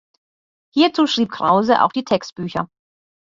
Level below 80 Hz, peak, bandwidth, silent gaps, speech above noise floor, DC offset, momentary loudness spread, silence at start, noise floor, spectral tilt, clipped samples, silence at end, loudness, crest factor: -60 dBFS; -2 dBFS; 7.6 kHz; none; over 73 dB; under 0.1%; 11 LU; 0.75 s; under -90 dBFS; -5 dB/octave; under 0.1%; 0.6 s; -18 LUFS; 18 dB